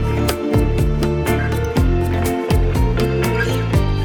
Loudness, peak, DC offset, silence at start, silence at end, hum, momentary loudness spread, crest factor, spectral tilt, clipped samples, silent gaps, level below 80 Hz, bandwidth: -18 LUFS; -2 dBFS; under 0.1%; 0 s; 0 s; none; 2 LU; 14 dB; -6.5 dB/octave; under 0.1%; none; -22 dBFS; over 20 kHz